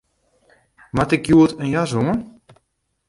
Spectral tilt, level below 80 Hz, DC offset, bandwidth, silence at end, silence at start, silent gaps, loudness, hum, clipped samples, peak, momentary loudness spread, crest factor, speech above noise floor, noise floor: -7 dB/octave; -46 dBFS; under 0.1%; 11.5 kHz; 0.8 s; 0.95 s; none; -18 LUFS; none; under 0.1%; -2 dBFS; 10 LU; 18 dB; 54 dB; -71 dBFS